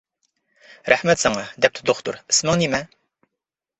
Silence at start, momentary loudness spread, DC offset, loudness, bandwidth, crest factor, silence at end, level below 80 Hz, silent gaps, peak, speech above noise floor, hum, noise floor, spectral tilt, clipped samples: 0.85 s; 9 LU; under 0.1%; -20 LUFS; 8.4 kHz; 22 dB; 0.95 s; -54 dBFS; none; 0 dBFS; 64 dB; none; -85 dBFS; -3 dB/octave; under 0.1%